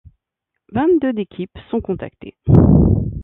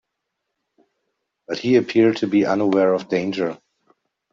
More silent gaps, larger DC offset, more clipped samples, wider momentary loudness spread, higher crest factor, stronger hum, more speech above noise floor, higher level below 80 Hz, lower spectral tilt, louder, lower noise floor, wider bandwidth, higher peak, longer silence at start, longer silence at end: neither; neither; neither; first, 16 LU vs 10 LU; about the same, 16 dB vs 16 dB; neither; first, 64 dB vs 60 dB; first, -28 dBFS vs -64 dBFS; first, -12 dB/octave vs -6.5 dB/octave; first, -16 LUFS vs -19 LUFS; about the same, -79 dBFS vs -79 dBFS; second, 4 kHz vs 7.4 kHz; first, 0 dBFS vs -4 dBFS; second, 0.75 s vs 1.5 s; second, 0 s vs 0.75 s